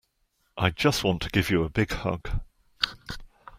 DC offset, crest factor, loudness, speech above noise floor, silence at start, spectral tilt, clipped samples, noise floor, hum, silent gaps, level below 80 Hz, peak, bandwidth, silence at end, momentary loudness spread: under 0.1%; 24 dB; -27 LUFS; 46 dB; 0.55 s; -5 dB/octave; under 0.1%; -72 dBFS; none; none; -40 dBFS; -4 dBFS; 16 kHz; 0 s; 17 LU